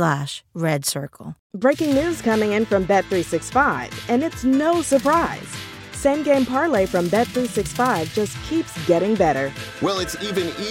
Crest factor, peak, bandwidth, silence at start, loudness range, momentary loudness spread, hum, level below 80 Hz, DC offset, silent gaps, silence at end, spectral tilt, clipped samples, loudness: 16 dB; -4 dBFS; 17 kHz; 0 s; 1 LU; 9 LU; none; -46 dBFS; under 0.1%; 1.39-1.50 s; 0 s; -5 dB/octave; under 0.1%; -21 LUFS